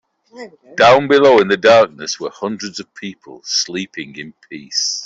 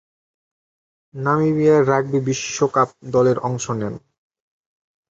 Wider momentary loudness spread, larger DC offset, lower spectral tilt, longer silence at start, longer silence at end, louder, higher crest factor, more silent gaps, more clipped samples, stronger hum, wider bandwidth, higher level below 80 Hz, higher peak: first, 21 LU vs 11 LU; neither; second, -3 dB/octave vs -6 dB/octave; second, 0.35 s vs 1.15 s; second, 0 s vs 1.15 s; first, -14 LUFS vs -19 LUFS; about the same, 16 dB vs 18 dB; neither; neither; neither; about the same, 7.8 kHz vs 8 kHz; about the same, -58 dBFS vs -58 dBFS; about the same, 0 dBFS vs -2 dBFS